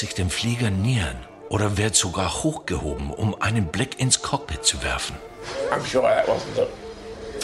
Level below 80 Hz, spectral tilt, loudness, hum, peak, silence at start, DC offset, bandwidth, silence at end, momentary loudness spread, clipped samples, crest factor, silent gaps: -40 dBFS; -4 dB/octave; -23 LUFS; none; -4 dBFS; 0 s; under 0.1%; 13 kHz; 0 s; 11 LU; under 0.1%; 20 dB; none